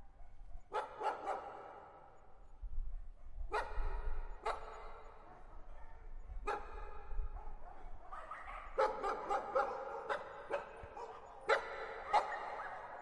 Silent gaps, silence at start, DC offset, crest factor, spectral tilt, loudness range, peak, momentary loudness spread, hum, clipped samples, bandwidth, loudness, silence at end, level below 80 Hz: none; 0 s; under 0.1%; 24 dB; -4.5 dB/octave; 10 LU; -18 dBFS; 22 LU; none; under 0.1%; 10.5 kHz; -42 LUFS; 0 s; -48 dBFS